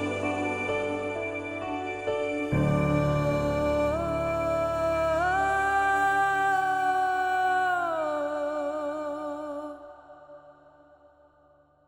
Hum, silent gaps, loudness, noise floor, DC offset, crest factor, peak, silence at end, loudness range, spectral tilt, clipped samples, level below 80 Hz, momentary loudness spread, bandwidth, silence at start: none; none; -27 LUFS; -61 dBFS; under 0.1%; 14 dB; -12 dBFS; 1.35 s; 9 LU; -6.5 dB/octave; under 0.1%; -48 dBFS; 9 LU; 16.5 kHz; 0 s